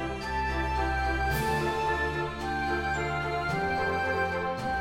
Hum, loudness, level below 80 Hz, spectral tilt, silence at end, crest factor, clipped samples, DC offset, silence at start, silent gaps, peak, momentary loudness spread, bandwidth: none; -29 LUFS; -38 dBFS; -5.5 dB/octave; 0 s; 14 dB; under 0.1%; under 0.1%; 0 s; none; -16 dBFS; 3 LU; 16 kHz